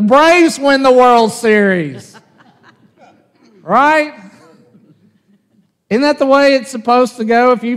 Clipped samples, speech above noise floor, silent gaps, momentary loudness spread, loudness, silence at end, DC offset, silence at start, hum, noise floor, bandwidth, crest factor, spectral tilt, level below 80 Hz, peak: under 0.1%; 46 dB; none; 8 LU; -11 LUFS; 0 s; under 0.1%; 0 s; none; -57 dBFS; 14.5 kHz; 12 dB; -4.5 dB/octave; -56 dBFS; 0 dBFS